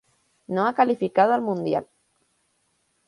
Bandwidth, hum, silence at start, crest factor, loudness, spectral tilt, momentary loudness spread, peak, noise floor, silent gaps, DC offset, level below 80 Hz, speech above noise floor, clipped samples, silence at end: 11 kHz; none; 0.5 s; 20 dB; -23 LUFS; -7.5 dB/octave; 8 LU; -4 dBFS; -70 dBFS; none; under 0.1%; -72 dBFS; 48 dB; under 0.1%; 1.25 s